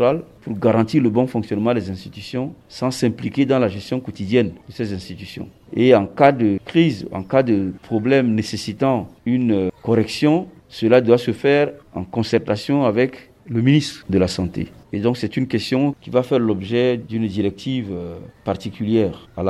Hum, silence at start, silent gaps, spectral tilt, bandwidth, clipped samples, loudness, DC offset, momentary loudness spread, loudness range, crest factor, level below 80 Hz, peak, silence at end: none; 0 s; none; -7 dB/octave; 13 kHz; under 0.1%; -19 LUFS; under 0.1%; 12 LU; 4 LU; 18 dB; -52 dBFS; 0 dBFS; 0 s